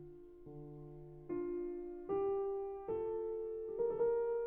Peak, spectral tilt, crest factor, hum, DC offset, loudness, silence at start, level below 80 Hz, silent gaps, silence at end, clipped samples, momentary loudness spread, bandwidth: -26 dBFS; -9 dB/octave; 14 dB; none; under 0.1%; -40 LUFS; 0 s; -64 dBFS; none; 0 s; under 0.1%; 18 LU; 3 kHz